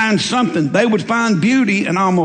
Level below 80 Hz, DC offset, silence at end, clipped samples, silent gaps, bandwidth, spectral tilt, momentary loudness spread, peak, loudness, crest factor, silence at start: -58 dBFS; under 0.1%; 0 s; under 0.1%; none; 9.4 kHz; -5 dB/octave; 2 LU; -2 dBFS; -15 LUFS; 14 dB; 0 s